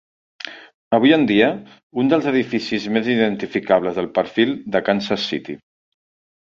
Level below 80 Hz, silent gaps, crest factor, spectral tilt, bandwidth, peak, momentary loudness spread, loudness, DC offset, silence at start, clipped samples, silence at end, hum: -58 dBFS; 0.74-0.91 s, 1.83-1.90 s; 18 dB; -6 dB/octave; 7.4 kHz; -2 dBFS; 19 LU; -19 LUFS; under 0.1%; 0.45 s; under 0.1%; 0.9 s; none